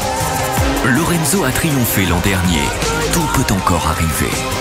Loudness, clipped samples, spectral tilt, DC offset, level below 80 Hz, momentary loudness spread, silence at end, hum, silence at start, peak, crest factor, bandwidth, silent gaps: -15 LUFS; under 0.1%; -4 dB/octave; under 0.1%; -26 dBFS; 3 LU; 0 s; none; 0 s; 0 dBFS; 16 dB; 16.5 kHz; none